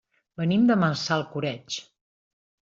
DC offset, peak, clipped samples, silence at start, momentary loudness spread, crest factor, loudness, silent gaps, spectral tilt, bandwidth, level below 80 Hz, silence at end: under 0.1%; -10 dBFS; under 0.1%; 0.4 s; 14 LU; 18 dB; -25 LUFS; none; -5.5 dB/octave; 7.6 kHz; -66 dBFS; 0.9 s